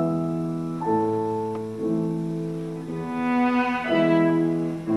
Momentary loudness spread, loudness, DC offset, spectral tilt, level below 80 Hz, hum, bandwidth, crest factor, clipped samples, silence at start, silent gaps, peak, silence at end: 10 LU; -24 LUFS; 0.1%; -8 dB/octave; -62 dBFS; none; 11.5 kHz; 16 dB; under 0.1%; 0 s; none; -8 dBFS; 0 s